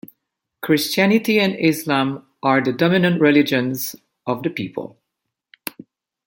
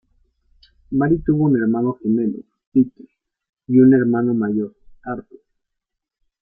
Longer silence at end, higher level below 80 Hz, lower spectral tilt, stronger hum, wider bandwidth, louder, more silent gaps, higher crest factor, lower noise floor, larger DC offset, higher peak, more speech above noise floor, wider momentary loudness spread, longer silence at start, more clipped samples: first, 1.4 s vs 1.2 s; second, -64 dBFS vs -48 dBFS; second, -5.5 dB/octave vs -13.5 dB/octave; neither; first, 17 kHz vs 2.4 kHz; about the same, -18 LUFS vs -18 LUFS; second, none vs 2.67-2.72 s, 3.49-3.53 s; about the same, 18 dB vs 16 dB; about the same, -80 dBFS vs -80 dBFS; neither; about the same, -2 dBFS vs -4 dBFS; about the same, 62 dB vs 63 dB; about the same, 17 LU vs 17 LU; second, 0.6 s vs 0.9 s; neither